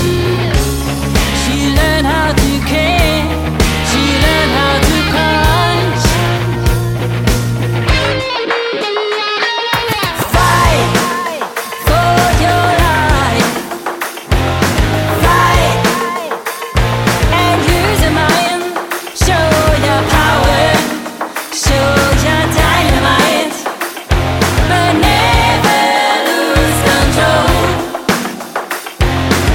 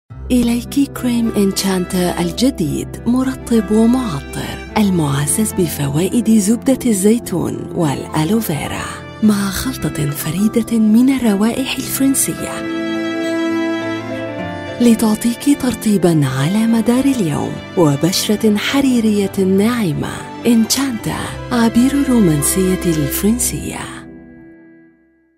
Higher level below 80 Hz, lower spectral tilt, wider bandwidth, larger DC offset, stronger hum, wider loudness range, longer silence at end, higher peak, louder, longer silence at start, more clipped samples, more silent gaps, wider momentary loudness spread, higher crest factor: first, -20 dBFS vs -38 dBFS; about the same, -4.5 dB/octave vs -5 dB/octave; about the same, 17.5 kHz vs 16.5 kHz; neither; neither; about the same, 2 LU vs 3 LU; second, 0 s vs 0.85 s; about the same, 0 dBFS vs 0 dBFS; first, -12 LUFS vs -16 LUFS; about the same, 0 s vs 0.1 s; neither; neither; about the same, 8 LU vs 9 LU; about the same, 12 dB vs 16 dB